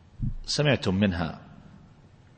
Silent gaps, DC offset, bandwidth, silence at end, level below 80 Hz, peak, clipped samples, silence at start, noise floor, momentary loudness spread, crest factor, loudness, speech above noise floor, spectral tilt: none; under 0.1%; 8.8 kHz; 0.65 s; -42 dBFS; -10 dBFS; under 0.1%; 0.2 s; -54 dBFS; 12 LU; 18 dB; -27 LUFS; 28 dB; -5.5 dB/octave